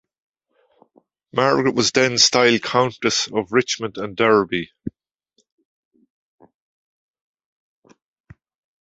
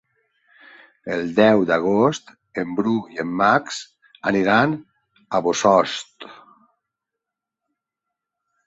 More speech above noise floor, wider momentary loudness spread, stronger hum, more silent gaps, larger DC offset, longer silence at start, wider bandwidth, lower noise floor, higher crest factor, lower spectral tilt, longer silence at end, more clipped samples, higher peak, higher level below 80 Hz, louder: second, 51 dB vs 65 dB; second, 13 LU vs 16 LU; neither; neither; neither; first, 1.35 s vs 1.05 s; about the same, 8.2 kHz vs 8 kHz; second, -69 dBFS vs -84 dBFS; about the same, 22 dB vs 20 dB; second, -3 dB/octave vs -5 dB/octave; first, 3.9 s vs 2.35 s; neither; about the same, 0 dBFS vs -2 dBFS; about the same, -58 dBFS vs -62 dBFS; about the same, -18 LUFS vs -20 LUFS